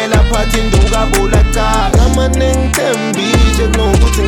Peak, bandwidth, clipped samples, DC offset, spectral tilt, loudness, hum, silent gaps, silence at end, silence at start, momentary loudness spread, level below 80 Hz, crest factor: 0 dBFS; 17.5 kHz; under 0.1%; under 0.1%; -5 dB/octave; -12 LUFS; none; none; 0 s; 0 s; 2 LU; -12 dBFS; 10 dB